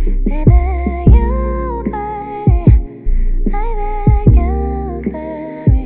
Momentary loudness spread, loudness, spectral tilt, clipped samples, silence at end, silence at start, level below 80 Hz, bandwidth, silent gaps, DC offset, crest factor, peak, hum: 11 LU; -15 LUFS; -10.5 dB/octave; under 0.1%; 0 s; 0 s; -14 dBFS; 2.8 kHz; none; under 0.1%; 12 dB; 0 dBFS; none